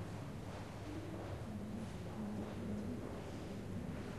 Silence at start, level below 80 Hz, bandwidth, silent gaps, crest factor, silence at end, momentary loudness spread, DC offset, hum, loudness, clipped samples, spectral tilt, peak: 0 s; -58 dBFS; 13 kHz; none; 12 dB; 0 s; 4 LU; 0.1%; none; -46 LUFS; under 0.1%; -7 dB/octave; -32 dBFS